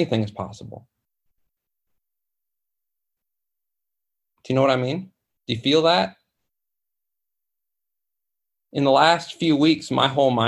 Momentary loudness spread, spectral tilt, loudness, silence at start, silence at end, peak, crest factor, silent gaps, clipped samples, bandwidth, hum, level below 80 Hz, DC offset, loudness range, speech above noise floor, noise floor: 15 LU; -5.5 dB/octave; -20 LUFS; 0 s; 0 s; -2 dBFS; 22 dB; none; under 0.1%; 11.5 kHz; none; -62 dBFS; under 0.1%; 7 LU; 66 dB; -86 dBFS